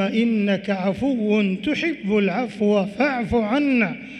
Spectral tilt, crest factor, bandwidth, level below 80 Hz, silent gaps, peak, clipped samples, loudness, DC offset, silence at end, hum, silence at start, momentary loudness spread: -7 dB/octave; 12 dB; 9 kHz; -50 dBFS; none; -8 dBFS; under 0.1%; -21 LUFS; under 0.1%; 0 s; none; 0 s; 3 LU